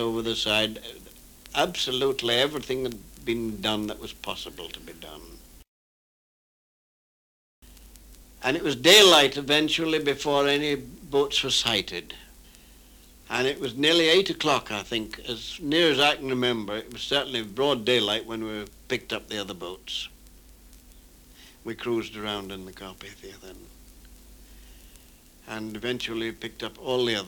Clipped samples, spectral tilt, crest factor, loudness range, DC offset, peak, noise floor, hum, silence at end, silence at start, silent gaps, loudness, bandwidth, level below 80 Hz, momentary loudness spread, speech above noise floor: under 0.1%; -3 dB/octave; 24 dB; 17 LU; under 0.1%; -2 dBFS; -53 dBFS; none; 0 s; 0 s; 5.68-7.62 s; -24 LUFS; 19.5 kHz; -54 dBFS; 19 LU; 27 dB